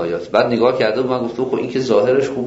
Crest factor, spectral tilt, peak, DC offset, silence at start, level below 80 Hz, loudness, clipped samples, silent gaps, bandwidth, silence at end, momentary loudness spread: 16 dB; -6 dB/octave; -2 dBFS; under 0.1%; 0 s; -54 dBFS; -17 LUFS; under 0.1%; none; 8 kHz; 0 s; 6 LU